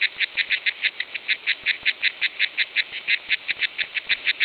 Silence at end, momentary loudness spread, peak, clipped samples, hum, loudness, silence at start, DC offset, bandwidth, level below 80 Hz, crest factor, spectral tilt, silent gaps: 0 s; 3 LU; -6 dBFS; under 0.1%; none; -23 LUFS; 0 s; under 0.1%; 5.2 kHz; -68 dBFS; 18 dB; -1.5 dB/octave; none